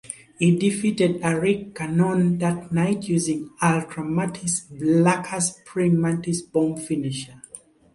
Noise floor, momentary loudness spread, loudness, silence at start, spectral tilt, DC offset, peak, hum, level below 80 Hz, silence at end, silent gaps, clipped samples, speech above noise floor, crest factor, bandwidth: -46 dBFS; 7 LU; -23 LUFS; 0.05 s; -5.5 dB/octave; under 0.1%; -6 dBFS; none; -58 dBFS; 0.4 s; none; under 0.1%; 24 dB; 16 dB; 11.5 kHz